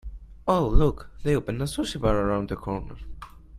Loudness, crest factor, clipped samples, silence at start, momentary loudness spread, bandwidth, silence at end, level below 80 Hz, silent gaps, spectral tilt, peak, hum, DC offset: -26 LUFS; 20 dB; under 0.1%; 0.05 s; 19 LU; 14 kHz; 0 s; -30 dBFS; none; -6.5 dB/octave; -4 dBFS; none; under 0.1%